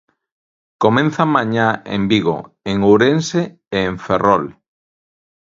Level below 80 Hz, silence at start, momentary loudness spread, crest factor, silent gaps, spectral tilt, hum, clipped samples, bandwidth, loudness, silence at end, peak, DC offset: -48 dBFS; 0.8 s; 9 LU; 18 dB; none; -6 dB/octave; none; under 0.1%; 7.6 kHz; -16 LUFS; 0.9 s; 0 dBFS; under 0.1%